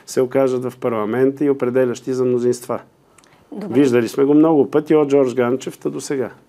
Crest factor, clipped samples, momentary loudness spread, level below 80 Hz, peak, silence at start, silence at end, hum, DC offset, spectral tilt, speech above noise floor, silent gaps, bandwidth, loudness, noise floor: 14 dB; under 0.1%; 11 LU; -68 dBFS; -4 dBFS; 0.1 s; 0.15 s; none; under 0.1%; -6.5 dB/octave; 34 dB; none; 14.5 kHz; -18 LUFS; -51 dBFS